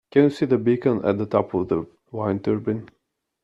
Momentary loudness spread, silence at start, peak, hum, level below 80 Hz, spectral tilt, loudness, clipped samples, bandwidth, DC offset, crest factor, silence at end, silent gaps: 9 LU; 0.15 s; -4 dBFS; none; -60 dBFS; -9 dB/octave; -23 LUFS; under 0.1%; 9.8 kHz; under 0.1%; 18 dB; 0.55 s; none